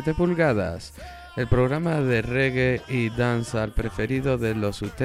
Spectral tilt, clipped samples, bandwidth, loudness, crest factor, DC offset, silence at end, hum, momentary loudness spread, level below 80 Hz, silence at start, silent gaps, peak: -7 dB/octave; under 0.1%; 14.5 kHz; -24 LUFS; 18 dB; under 0.1%; 0 s; none; 9 LU; -38 dBFS; 0 s; none; -6 dBFS